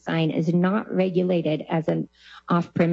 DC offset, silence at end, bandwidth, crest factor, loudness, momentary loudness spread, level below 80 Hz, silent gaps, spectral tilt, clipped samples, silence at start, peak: under 0.1%; 0 s; 7 kHz; 14 dB; -24 LUFS; 6 LU; -66 dBFS; none; -8.5 dB/octave; under 0.1%; 0.05 s; -8 dBFS